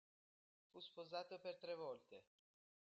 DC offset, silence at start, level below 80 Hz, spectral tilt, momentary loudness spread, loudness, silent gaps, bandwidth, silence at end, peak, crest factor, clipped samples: under 0.1%; 0.75 s; under -90 dBFS; -2 dB/octave; 15 LU; -53 LUFS; none; 7.6 kHz; 0.7 s; -36 dBFS; 20 dB; under 0.1%